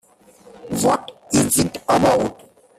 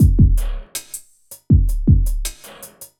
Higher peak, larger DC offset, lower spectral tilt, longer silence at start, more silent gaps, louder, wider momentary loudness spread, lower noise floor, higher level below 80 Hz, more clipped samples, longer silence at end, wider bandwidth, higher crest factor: about the same, -4 dBFS vs -2 dBFS; neither; second, -4 dB/octave vs -6.5 dB/octave; first, 0.65 s vs 0 s; neither; about the same, -19 LUFS vs -19 LUFS; second, 9 LU vs 20 LU; first, -49 dBFS vs -44 dBFS; second, -48 dBFS vs -20 dBFS; neither; first, 0.45 s vs 0.15 s; about the same, 15.5 kHz vs 17 kHz; about the same, 18 dB vs 14 dB